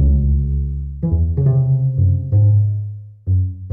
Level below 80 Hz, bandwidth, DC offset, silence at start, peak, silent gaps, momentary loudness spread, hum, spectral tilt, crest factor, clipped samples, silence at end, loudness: -22 dBFS; 1.3 kHz; under 0.1%; 0 s; -8 dBFS; none; 10 LU; none; -14.5 dB/octave; 8 dB; under 0.1%; 0 s; -17 LUFS